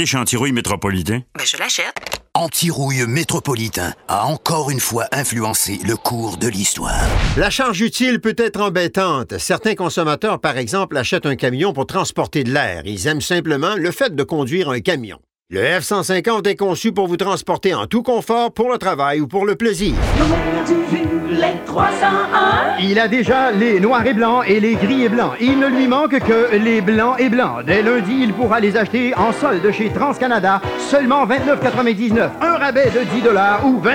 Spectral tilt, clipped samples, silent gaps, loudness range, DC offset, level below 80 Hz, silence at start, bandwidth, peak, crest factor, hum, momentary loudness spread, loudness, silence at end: -4.5 dB/octave; under 0.1%; none; 4 LU; under 0.1%; -34 dBFS; 0 s; 17.5 kHz; -2 dBFS; 14 dB; none; 5 LU; -17 LUFS; 0 s